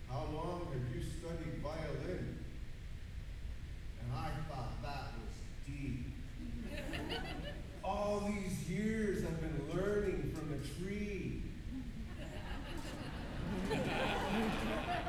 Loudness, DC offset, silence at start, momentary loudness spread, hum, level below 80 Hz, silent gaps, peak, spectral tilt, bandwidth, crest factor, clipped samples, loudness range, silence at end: -42 LUFS; under 0.1%; 0 s; 12 LU; none; -48 dBFS; none; -24 dBFS; -6 dB/octave; 17 kHz; 16 dB; under 0.1%; 6 LU; 0 s